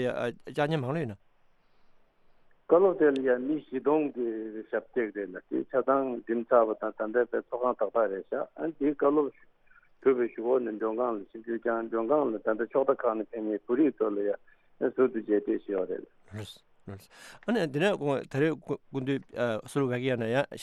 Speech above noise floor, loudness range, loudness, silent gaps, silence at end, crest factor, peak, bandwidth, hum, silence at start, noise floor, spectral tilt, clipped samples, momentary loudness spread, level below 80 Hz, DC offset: 34 dB; 3 LU; -29 LUFS; none; 0 s; 20 dB; -10 dBFS; 12 kHz; none; 0 s; -63 dBFS; -7 dB/octave; under 0.1%; 11 LU; -70 dBFS; under 0.1%